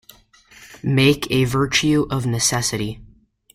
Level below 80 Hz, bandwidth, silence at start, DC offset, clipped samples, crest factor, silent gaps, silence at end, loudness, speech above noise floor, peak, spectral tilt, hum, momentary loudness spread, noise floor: -44 dBFS; 16 kHz; 0.6 s; under 0.1%; under 0.1%; 18 dB; none; 0.5 s; -19 LUFS; 32 dB; -4 dBFS; -4 dB/octave; none; 12 LU; -51 dBFS